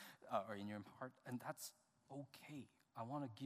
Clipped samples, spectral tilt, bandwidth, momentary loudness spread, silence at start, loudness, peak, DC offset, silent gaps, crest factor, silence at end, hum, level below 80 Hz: under 0.1%; -5 dB/octave; 15.5 kHz; 11 LU; 0 s; -52 LUFS; -28 dBFS; under 0.1%; none; 24 dB; 0 s; none; under -90 dBFS